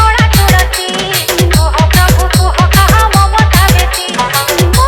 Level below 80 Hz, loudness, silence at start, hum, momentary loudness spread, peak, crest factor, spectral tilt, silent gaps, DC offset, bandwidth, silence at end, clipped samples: -14 dBFS; -9 LUFS; 0 s; none; 5 LU; 0 dBFS; 8 dB; -4 dB/octave; none; under 0.1%; 18.5 kHz; 0 s; 0.4%